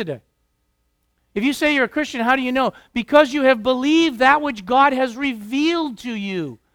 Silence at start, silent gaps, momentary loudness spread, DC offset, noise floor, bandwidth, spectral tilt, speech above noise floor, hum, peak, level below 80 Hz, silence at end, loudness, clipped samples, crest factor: 0 s; none; 12 LU; under 0.1%; -68 dBFS; 17 kHz; -4.5 dB/octave; 50 dB; none; 0 dBFS; -54 dBFS; 0.2 s; -18 LUFS; under 0.1%; 20 dB